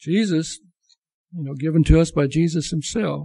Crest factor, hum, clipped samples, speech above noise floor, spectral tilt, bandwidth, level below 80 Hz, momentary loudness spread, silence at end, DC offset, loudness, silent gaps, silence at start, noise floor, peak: 18 dB; none; under 0.1%; 42 dB; -6.5 dB/octave; 11.5 kHz; -30 dBFS; 16 LU; 0 s; under 0.1%; -20 LUFS; 0.98-1.02 s, 1.13-1.28 s; 0 s; -62 dBFS; -2 dBFS